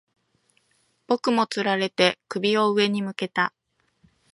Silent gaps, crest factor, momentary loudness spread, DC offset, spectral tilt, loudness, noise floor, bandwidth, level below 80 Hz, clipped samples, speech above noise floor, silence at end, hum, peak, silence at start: none; 22 dB; 7 LU; under 0.1%; -4.5 dB/octave; -23 LUFS; -68 dBFS; 11.5 kHz; -74 dBFS; under 0.1%; 45 dB; 0.85 s; none; -4 dBFS; 1.1 s